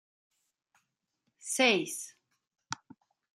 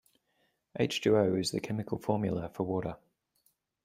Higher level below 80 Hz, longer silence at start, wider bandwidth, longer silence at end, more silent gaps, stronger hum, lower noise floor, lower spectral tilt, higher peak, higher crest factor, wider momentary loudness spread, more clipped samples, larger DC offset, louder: second, -88 dBFS vs -64 dBFS; first, 1.45 s vs 0.75 s; about the same, 14.5 kHz vs 15.5 kHz; second, 0.65 s vs 0.9 s; neither; neither; first, -82 dBFS vs -76 dBFS; second, -2 dB/octave vs -5.5 dB/octave; about the same, -12 dBFS vs -14 dBFS; first, 26 dB vs 20 dB; first, 20 LU vs 12 LU; neither; neither; first, -29 LUFS vs -32 LUFS